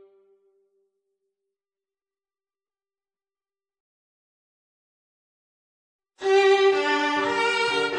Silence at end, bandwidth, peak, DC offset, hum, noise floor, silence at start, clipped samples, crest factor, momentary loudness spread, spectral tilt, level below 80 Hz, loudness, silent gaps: 0 s; 9.8 kHz; -8 dBFS; under 0.1%; none; under -90 dBFS; 6.2 s; under 0.1%; 20 dB; 5 LU; -2.5 dB/octave; -76 dBFS; -21 LUFS; none